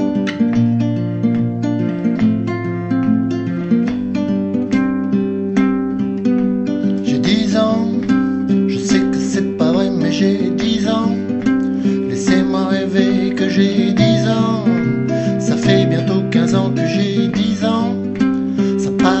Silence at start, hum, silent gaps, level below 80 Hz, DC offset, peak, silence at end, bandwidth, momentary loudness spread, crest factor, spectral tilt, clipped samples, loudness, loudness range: 0 s; none; none; -46 dBFS; under 0.1%; 0 dBFS; 0 s; 8.2 kHz; 4 LU; 14 dB; -6.5 dB/octave; under 0.1%; -16 LUFS; 3 LU